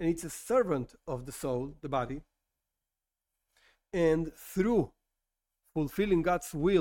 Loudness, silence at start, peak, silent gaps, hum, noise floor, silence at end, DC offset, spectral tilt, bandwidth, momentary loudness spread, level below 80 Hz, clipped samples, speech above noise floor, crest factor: -32 LUFS; 0 s; -14 dBFS; none; none; -89 dBFS; 0 s; under 0.1%; -6.5 dB/octave; 17 kHz; 11 LU; -52 dBFS; under 0.1%; 59 dB; 18 dB